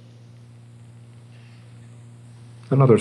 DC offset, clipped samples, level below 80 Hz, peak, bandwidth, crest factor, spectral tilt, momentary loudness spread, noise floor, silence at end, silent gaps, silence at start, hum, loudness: under 0.1%; under 0.1%; -74 dBFS; -2 dBFS; 8.8 kHz; 22 dB; -9.5 dB/octave; 26 LU; -45 dBFS; 0 s; none; 2.7 s; none; -19 LUFS